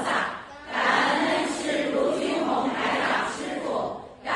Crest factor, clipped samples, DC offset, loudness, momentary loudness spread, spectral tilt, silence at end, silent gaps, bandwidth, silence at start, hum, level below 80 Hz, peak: 18 dB; under 0.1%; under 0.1%; -25 LUFS; 10 LU; -3.5 dB/octave; 0 s; none; 11.5 kHz; 0 s; none; -60 dBFS; -8 dBFS